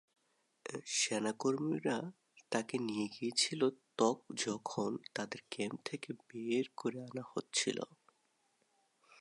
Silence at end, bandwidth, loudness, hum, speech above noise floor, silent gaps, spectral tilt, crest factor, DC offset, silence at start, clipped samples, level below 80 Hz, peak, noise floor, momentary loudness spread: 0.05 s; 11.5 kHz; -38 LUFS; none; 40 dB; none; -3 dB/octave; 22 dB; under 0.1%; 0.65 s; under 0.1%; -86 dBFS; -18 dBFS; -78 dBFS; 12 LU